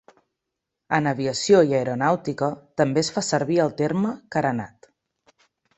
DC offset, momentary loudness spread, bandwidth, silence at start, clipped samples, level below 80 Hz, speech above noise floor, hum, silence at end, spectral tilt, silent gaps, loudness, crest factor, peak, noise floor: under 0.1%; 9 LU; 8.4 kHz; 0.9 s; under 0.1%; -62 dBFS; 61 dB; none; 1.1 s; -5 dB/octave; none; -22 LUFS; 20 dB; -4 dBFS; -83 dBFS